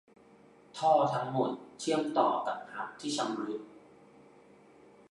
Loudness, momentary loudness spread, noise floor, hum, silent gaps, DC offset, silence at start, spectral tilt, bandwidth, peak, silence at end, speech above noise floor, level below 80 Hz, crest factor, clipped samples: -32 LUFS; 14 LU; -59 dBFS; none; none; under 0.1%; 0.75 s; -5 dB/octave; 11.5 kHz; -14 dBFS; 1.3 s; 28 dB; -80 dBFS; 20 dB; under 0.1%